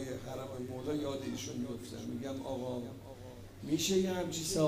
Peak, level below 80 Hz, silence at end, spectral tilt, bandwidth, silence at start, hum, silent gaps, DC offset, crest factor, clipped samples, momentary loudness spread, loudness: -18 dBFS; -58 dBFS; 0 s; -4.5 dB/octave; 15.5 kHz; 0 s; none; none; under 0.1%; 18 dB; under 0.1%; 16 LU; -37 LUFS